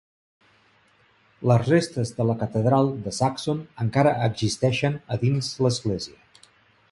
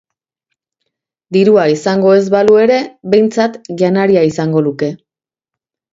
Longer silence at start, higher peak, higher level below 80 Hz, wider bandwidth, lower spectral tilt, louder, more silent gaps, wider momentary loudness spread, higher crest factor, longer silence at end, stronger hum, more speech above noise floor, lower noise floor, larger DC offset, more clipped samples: about the same, 1.4 s vs 1.3 s; second, -6 dBFS vs 0 dBFS; about the same, -54 dBFS vs -56 dBFS; first, 11.5 kHz vs 7.8 kHz; about the same, -6 dB/octave vs -6.5 dB/octave; second, -24 LUFS vs -12 LUFS; neither; about the same, 8 LU vs 8 LU; first, 20 dB vs 12 dB; second, 0.85 s vs 1 s; neither; second, 38 dB vs 73 dB; second, -60 dBFS vs -84 dBFS; neither; neither